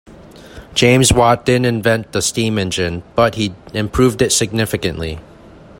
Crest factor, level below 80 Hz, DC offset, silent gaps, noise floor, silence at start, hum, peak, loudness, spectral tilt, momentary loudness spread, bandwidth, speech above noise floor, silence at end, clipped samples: 16 dB; -36 dBFS; under 0.1%; none; -40 dBFS; 0.1 s; none; 0 dBFS; -15 LUFS; -4 dB/octave; 11 LU; 16.5 kHz; 25 dB; 0.3 s; under 0.1%